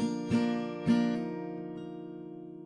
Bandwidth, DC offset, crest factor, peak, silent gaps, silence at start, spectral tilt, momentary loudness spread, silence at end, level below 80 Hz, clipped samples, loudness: 10.5 kHz; under 0.1%; 16 dB; -16 dBFS; none; 0 s; -7 dB/octave; 15 LU; 0 s; -68 dBFS; under 0.1%; -32 LUFS